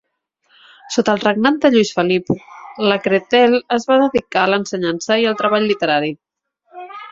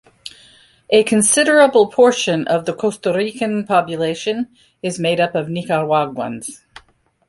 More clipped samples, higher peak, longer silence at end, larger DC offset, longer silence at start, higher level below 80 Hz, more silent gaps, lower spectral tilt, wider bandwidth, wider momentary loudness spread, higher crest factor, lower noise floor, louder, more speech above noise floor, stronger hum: neither; about the same, 0 dBFS vs 0 dBFS; second, 0 s vs 0.75 s; neither; first, 0.85 s vs 0.25 s; about the same, -58 dBFS vs -60 dBFS; neither; about the same, -4.5 dB/octave vs -3.5 dB/octave; second, 7.8 kHz vs 12 kHz; second, 11 LU vs 15 LU; about the same, 16 dB vs 16 dB; first, -65 dBFS vs -55 dBFS; about the same, -16 LUFS vs -16 LUFS; first, 49 dB vs 39 dB; neither